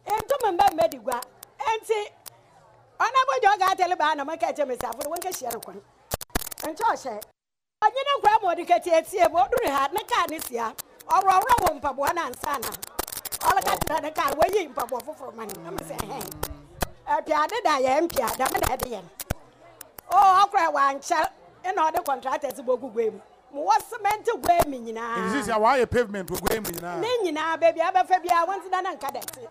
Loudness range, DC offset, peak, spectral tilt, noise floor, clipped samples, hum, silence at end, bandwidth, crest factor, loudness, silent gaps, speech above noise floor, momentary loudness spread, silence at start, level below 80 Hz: 5 LU; under 0.1%; -8 dBFS; -3.5 dB/octave; -86 dBFS; under 0.1%; none; 0 s; 16 kHz; 18 dB; -24 LUFS; none; 62 dB; 13 LU; 0.05 s; -48 dBFS